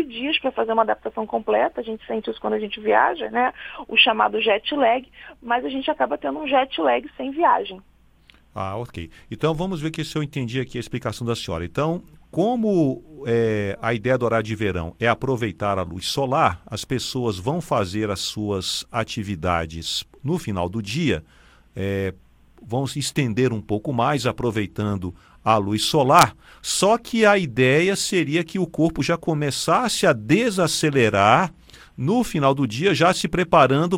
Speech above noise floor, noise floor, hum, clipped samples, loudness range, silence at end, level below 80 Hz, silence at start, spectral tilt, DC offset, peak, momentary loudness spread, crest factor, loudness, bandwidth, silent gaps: 32 dB; -54 dBFS; none; under 0.1%; 7 LU; 0 s; -48 dBFS; 0 s; -5 dB/octave; under 0.1%; 0 dBFS; 11 LU; 22 dB; -22 LUFS; 17 kHz; none